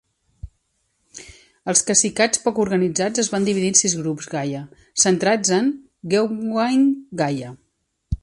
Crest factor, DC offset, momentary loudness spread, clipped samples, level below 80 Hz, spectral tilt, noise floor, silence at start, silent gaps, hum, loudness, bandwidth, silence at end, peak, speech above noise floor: 20 dB; under 0.1%; 16 LU; under 0.1%; -44 dBFS; -3.5 dB/octave; -70 dBFS; 0.45 s; none; none; -19 LUFS; 11.5 kHz; 0.05 s; -2 dBFS; 50 dB